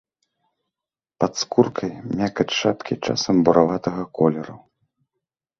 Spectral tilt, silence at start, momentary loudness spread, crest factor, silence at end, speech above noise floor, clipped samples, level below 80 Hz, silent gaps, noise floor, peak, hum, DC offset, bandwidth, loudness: -5.5 dB/octave; 1.2 s; 11 LU; 22 dB; 1 s; 68 dB; under 0.1%; -56 dBFS; none; -89 dBFS; 0 dBFS; none; under 0.1%; 7.6 kHz; -21 LUFS